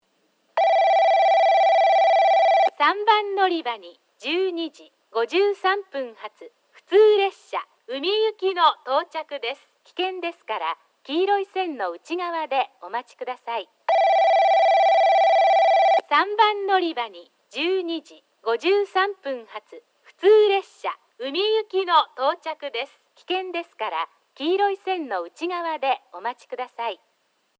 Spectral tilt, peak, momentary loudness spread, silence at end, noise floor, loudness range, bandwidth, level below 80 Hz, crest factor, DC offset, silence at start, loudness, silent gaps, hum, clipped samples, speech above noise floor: -1.5 dB/octave; -6 dBFS; 15 LU; 0.65 s; -67 dBFS; 9 LU; 8 kHz; -90 dBFS; 16 dB; under 0.1%; 0.55 s; -21 LUFS; none; none; under 0.1%; 44 dB